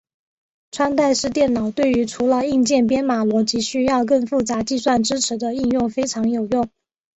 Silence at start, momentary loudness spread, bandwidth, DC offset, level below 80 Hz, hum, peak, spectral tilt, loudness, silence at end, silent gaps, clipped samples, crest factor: 0.75 s; 5 LU; 8.2 kHz; under 0.1%; -50 dBFS; none; -6 dBFS; -4 dB/octave; -19 LUFS; 0.5 s; none; under 0.1%; 14 dB